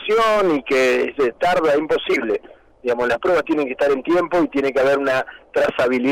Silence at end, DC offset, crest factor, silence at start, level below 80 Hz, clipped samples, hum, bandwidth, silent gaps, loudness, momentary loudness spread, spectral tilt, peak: 0 s; under 0.1%; 6 dB; 0 s; -52 dBFS; under 0.1%; none; 16 kHz; none; -19 LUFS; 6 LU; -5 dB/octave; -12 dBFS